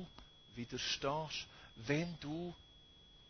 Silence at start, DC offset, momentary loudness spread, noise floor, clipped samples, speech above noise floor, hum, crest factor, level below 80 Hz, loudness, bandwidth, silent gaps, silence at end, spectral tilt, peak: 0 s; under 0.1%; 22 LU; -63 dBFS; under 0.1%; 22 dB; none; 22 dB; -64 dBFS; -41 LUFS; 6.6 kHz; none; 0 s; -4.5 dB/octave; -22 dBFS